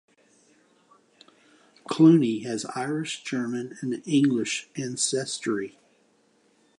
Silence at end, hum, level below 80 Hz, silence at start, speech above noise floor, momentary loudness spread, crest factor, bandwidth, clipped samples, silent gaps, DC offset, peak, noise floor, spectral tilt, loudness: 1.1 s; none; -78 dBFS; 1.9 s; 40 dB; 14 LU; 20 dB; 11 kHz; under 0.1%; none; under 0.1%; -6 dBFS; -64 dBFS; -5 dB/octave; -25 LUFS